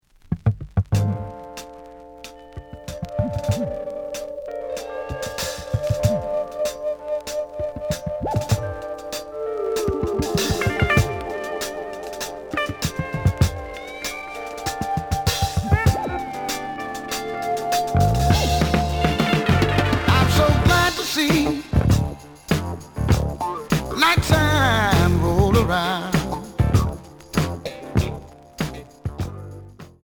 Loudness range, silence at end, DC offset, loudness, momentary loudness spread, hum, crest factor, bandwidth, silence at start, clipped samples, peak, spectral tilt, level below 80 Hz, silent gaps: 9 LU; 0.15 s; under 0.1%; -22 LUFS; 14 LU; none; 20 dB; over 20 kHz; 0.25 s; under 0.1%; -2 dBFS; -5.5 dB/octave; -34 dBFS; none